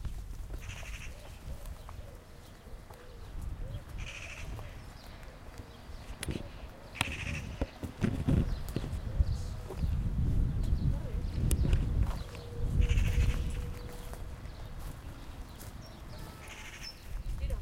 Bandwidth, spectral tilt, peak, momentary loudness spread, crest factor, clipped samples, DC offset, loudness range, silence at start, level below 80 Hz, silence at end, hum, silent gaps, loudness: 16.5 kHz; -6 dB/octave; -10 dBFS; 18 LU; 24 dB; under 0.1%; under 0.1%; 13 LU; 0 s; -36 dBFS; 0 s; none; none; -37 LUFS